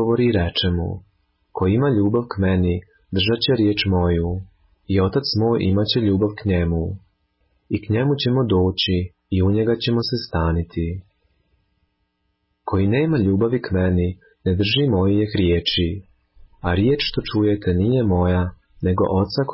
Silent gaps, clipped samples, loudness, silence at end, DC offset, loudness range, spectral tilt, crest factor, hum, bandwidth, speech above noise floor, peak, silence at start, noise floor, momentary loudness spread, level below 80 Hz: none; under 0.1%; -20 LUFS; 0 s; under 0.1%; 4 LU; -10.5 dB/octave; 14 dB; none; 5.8 kHz; 52 dB; -6 dBFS; 0 s; -71 dBFS; 9 LU; -34 dBFS